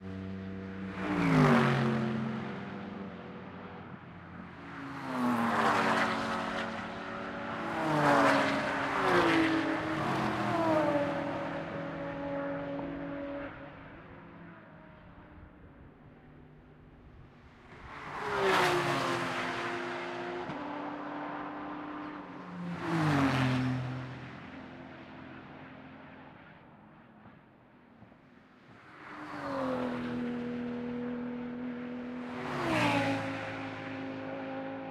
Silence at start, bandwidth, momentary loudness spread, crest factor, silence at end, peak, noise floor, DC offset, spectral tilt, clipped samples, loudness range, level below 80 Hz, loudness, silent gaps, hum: 0 s; 15 kHz; 21 LU; 24 dB; 0 s; -10 dBFS; -59 dBFS; under 0.1%; -6 dB/octave; under 0.1%; 20 LU; -62 dBFS; -32 LUFS; none; none